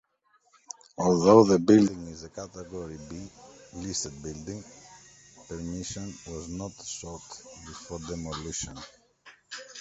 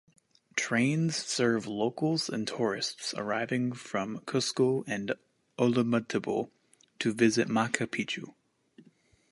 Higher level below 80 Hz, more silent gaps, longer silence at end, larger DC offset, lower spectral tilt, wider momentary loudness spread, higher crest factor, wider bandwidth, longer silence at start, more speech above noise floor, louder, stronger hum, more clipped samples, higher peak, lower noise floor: first, -54 dBFS vs -72 dBFS; neither; second, 0 s vs 1 s; neither; about the same, -5.5 dB/octave vs -4.5 dB/octave; first, 24 LU vs 8 LU; about the same, 24 dB vs 24 dB; second, 8.2 kHz vs 11.5 kHz; first, 0.7 s vs 0.55 s; first, 41 dB vs 34 dB; first, -26 LUFS vs -30 LUFS; neither; neither; first, -4 dBFS vs -8 dBFS; first, -68 dBFS vs -63 dBFS